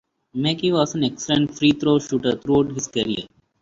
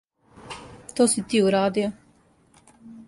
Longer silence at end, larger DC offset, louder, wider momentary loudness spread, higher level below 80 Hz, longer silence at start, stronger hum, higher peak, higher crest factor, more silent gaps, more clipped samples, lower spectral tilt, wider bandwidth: first, 0.35 s vs 0.05 s; neither; about the same, -21 LUFS vs -22 LUFS; second, 6 LU vs 20 LU; first, -54 dBFS vs -60 dBFS; about the same, 0.35 s vs 0.4 s; neither; first, -4 dBFS vs -8 dBFS; about the same, 16 dB vs 18 dB; neither; neither; about the same, -5 dB/octave vs -4 dB/octave; second, 7.8 kHz vs 11.5 kHz